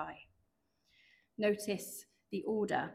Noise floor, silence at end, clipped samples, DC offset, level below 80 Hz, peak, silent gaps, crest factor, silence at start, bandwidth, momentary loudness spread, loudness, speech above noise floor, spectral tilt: -79 dBFS; 0 s; under 0.1%; under 0.1%; -76 dBFS; -20 dBFS; none; 18 dB; 0 s; 16 kHz; 17 LU; -37 LUFS; 43 dB; -4.5 dB/octave